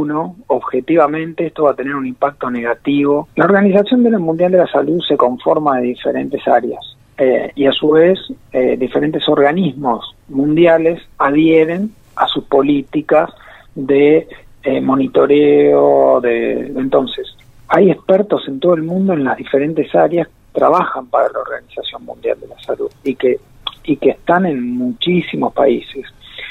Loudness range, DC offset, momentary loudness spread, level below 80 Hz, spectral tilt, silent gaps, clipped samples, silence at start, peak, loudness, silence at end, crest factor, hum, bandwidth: 5 LU; under 0.1%; 12 LU; -50 dBFS; -8 dB/octave; none; under 0.1%; 0 s; 0 dBFS; -14 LUFS; 0 s; 14 dB; none; 4.3 kHz